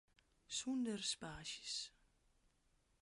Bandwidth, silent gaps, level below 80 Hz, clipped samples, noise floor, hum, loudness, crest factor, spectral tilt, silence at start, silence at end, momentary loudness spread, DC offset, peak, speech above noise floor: 11.5 kHz; none; -74 dBFS; under 0.1%; -79 dBFS; none; -45 LUFS; 20 dB; -2.5 dB/octave; 0.5 s; 1.1 s; 7 LU; under 0.1%; -30 dBFS; 34 dB